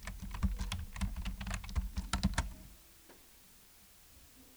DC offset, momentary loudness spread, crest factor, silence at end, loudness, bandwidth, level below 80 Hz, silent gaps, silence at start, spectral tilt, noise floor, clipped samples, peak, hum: under 0.1%; 21 LU; 24 dB; 0 s; -40 LUFS; over 20 kHz; -42 dBFS; none; 0 s; -4.5 dB/octave; -60 dBFS; under 0.1%; -16 dBFS; none